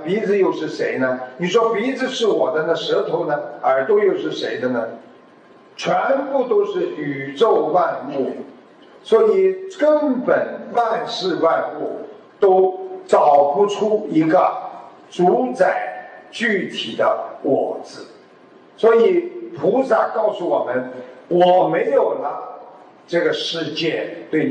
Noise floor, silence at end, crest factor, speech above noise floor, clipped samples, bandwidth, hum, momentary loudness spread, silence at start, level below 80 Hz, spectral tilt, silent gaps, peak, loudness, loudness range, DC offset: -47 dBFS; 0 s; 16 dB; 29 dB; under 0.1%; 9.2 kHz; none; 13 LU; 0 s; -76 dBFS; -5.5 dB/octave; none; -2 dBFS; -18 LUFS; 3 LU; under 0.1%